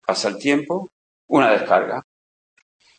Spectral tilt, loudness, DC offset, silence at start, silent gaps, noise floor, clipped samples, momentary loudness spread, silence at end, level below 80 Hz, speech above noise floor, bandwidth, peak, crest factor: -4.5 dB/octave; -20 LUFS; under 0.1%; 0.1 s; 0.92-1.28 s; under -90 dBFS; under 0.1%; 12 LU; 1 s; -70 dBFS; over 71 dB; 8.8 kHz; -2 dBFS; 20 dB